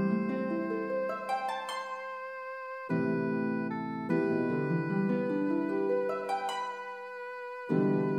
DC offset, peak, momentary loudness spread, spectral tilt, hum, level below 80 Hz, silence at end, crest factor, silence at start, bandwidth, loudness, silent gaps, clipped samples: under 0.1%; -16 dBFS; 10 LU; -7.5 dB/octave; none; -80 dBFS; 0 s; 16 dB; 0 s; 12.5 kHz; -33 LUFS; none; under 0.1%